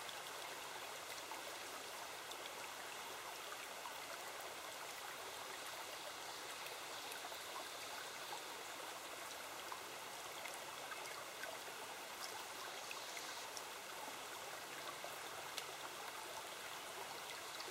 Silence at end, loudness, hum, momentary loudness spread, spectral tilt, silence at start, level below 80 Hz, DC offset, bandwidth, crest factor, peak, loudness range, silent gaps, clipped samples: 0 s; -48 LUFS; none; 1 LU; -0.5 dB/octave; 0 s; -84 dBFS; under 0.1%; 16 kHz; 24 dB; -26 dBFS; 1 LU; none; under 0.1%